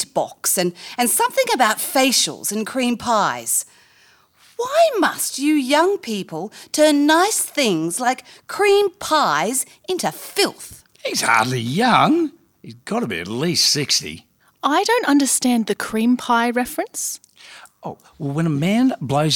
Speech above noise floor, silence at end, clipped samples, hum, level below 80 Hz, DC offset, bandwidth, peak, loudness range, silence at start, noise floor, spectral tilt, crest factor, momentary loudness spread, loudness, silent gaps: 35 dB; 0 s; under 0.1%; none; -62 dBFS; under 0.1%; over 20 kHz; 0 dBFS; 3 LU; 0 s; -54 dBFS; -3 dB/octave; 18 dB; 13 LU; -18 LUFS; none